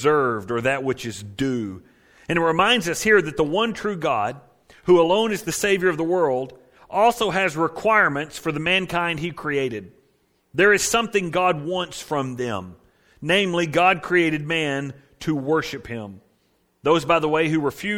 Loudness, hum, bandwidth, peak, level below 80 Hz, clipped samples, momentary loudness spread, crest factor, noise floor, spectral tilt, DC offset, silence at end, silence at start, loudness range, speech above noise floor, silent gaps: -21 LUFS; none; 17 kHz; -4 dBFS; -54 dBFS; under 0.1%; 11 LU; 18 dB; -65 dBFS; -4 dB/octave; under 0.1%; 0 s; 0 s; 2 LU; 44 dB; none